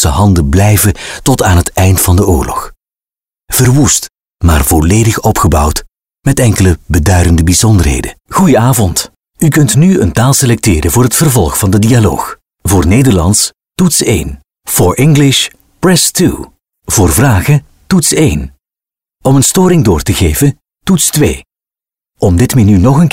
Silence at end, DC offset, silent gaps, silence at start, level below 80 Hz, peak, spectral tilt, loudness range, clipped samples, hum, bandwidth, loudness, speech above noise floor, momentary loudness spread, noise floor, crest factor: 0.05 s; under 0.1%; none; 0 s; -22 dBFS; 0 dBFS; -5 dB/octave; 2 LU; under 0.1%; none; 16.5 kHz; -9 LUFS; over 82 dB; 9 LU; under -90 dBFS; 8 dB